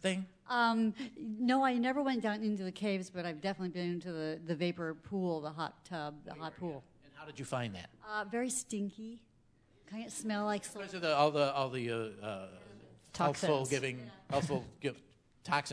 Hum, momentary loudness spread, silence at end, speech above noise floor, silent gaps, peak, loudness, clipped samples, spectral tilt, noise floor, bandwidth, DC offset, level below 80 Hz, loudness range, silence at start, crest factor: none; 16 LU; 0 s; 32 dB; none; -16 dBFS; -36 LUFS; under 0.1%; -5 dB/octave; -68 dBFS; 11 kHz; under 0.1%; -72 dBFS; 7 LU; 0 s; 22 dB